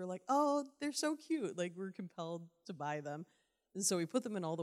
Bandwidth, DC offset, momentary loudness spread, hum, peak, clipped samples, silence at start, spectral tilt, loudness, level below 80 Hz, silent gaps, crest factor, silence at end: 15.5 kHz; under 0.1%; 14 LU; none; -22 dBFS; under 0.1%; 0 s; -4 dB/octave; -39 LUFS; under -90 dBFS; none; 18 dB; 0 s